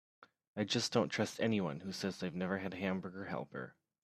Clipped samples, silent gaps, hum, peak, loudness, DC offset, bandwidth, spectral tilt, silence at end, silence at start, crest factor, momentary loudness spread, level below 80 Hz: under 0.1%; 0.47-0.54 s; none; -18 dBFS; -38 LUFS; under 0.1%; 14 kHz; -5 dB/octave; 0.3 s; 0.2 s; 22 dB; 11 LU; -76 dBFS